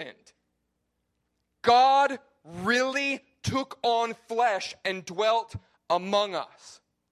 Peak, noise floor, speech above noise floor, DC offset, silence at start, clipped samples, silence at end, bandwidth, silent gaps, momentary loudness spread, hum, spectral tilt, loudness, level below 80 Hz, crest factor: -8 dBFS; -78 dBFS; 52 dB; under 0.1%; 0 s; under 0.1%; 0.35 s; 13 kHz; none; 18 LU; none; -4 dB/octave; -26 LUFS; -60 dBFS; 20 dB